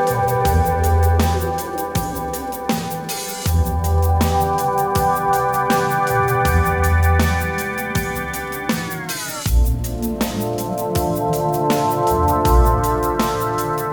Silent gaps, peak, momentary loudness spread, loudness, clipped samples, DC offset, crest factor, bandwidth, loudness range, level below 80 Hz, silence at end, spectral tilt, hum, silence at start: none; -2 dBFS; 8 LU; -19 LUFS; under 0.1%; under 0.1%; 16 dB; over 20 kHz; 4 LU; -24 dBFS; 0 s; -5.5 dB/octave; none; 0 s